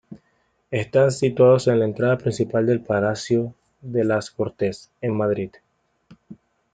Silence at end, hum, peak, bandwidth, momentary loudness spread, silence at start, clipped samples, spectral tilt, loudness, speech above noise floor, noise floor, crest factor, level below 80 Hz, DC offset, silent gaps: 0.4 s; none; -4 dBFS; 9.4 kHz; 12 LU; 0.1 s; under 0.1%; -7 dB/octave; -21 LUFS; 46 dB; -67 dBFS; 18 dB; -60 dBFS; under 0.1%; none